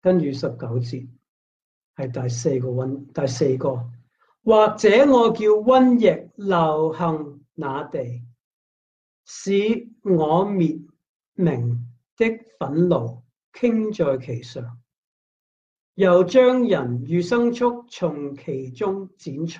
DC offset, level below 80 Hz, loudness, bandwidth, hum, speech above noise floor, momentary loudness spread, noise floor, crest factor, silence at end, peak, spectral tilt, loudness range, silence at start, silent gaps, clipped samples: under 0.1%; -60 dBFS; -21 LUFS; 9 kHz; none; over 70 dB; 17 LU; under -90 dBFS; 16 dB; 0 s; -4 dBFS; -7 dB/octave; 9 LU; 0.05 s; 1.28-1.94 s, 8.40-9.24 s, 11.09-11.20 s, 11.26-11.32 s, 12.11-12.17 s, 13.36-13.52 s, 14.98-15.95 s; under 0.1%